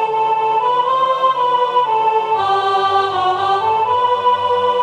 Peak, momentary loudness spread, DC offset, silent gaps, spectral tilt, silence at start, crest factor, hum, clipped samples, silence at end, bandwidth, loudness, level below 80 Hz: -4 dBFS; 1 LU; under 0.1%; none; -4 dB/octave; 0 s; 12 dB; none; under 0.1%; 0 s; 9.6 kHz; -15 LUFS; -64 dBFS